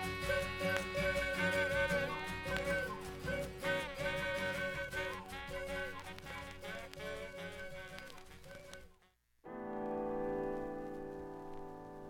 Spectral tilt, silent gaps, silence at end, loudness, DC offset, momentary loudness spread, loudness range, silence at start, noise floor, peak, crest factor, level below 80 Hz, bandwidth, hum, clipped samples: -4.5 dB/octave; none; 0 s; -39 LUFS; under 0.1%; 15 LU; 11 LU; 0 s; -72 dBFS; -18 dBFS; 22 dB; -56 dBFS; 17 kHz; none; under 0.1%